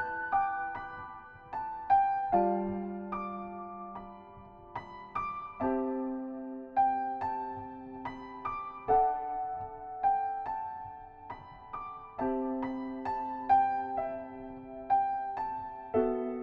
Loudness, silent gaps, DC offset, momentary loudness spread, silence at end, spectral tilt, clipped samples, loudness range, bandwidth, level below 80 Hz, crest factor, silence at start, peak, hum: -33 LUFS; none; under 0.1%; 17 LU; 0 s; -9 dB/octave; under 0.1%; 6 LU; 5.2 kHz; -60 dBFS; 18 dB; 0 s; -14 dBFS; none